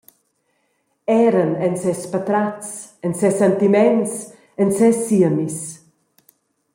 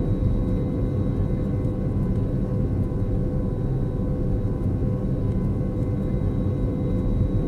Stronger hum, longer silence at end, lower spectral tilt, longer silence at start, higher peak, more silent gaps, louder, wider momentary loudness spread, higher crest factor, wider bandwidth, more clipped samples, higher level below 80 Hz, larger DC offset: neither; first, 1 s vs 0 s; second, -6.5 dB/octave vs -11 dB/octave; first, 1.1 s vs 0 s; first, -4 dBFS vs -10 dBFS; neither; first, -18 LUFS vs -25 LUFS; first, 15 LU vs 2 LU; about the same, 16 dB vs 12 dB; first, 16.5 kHz vs 4.6 kHz; neither; second, -64 dBFS vs -28 dBFS; second, under 0.1% vs 0.1%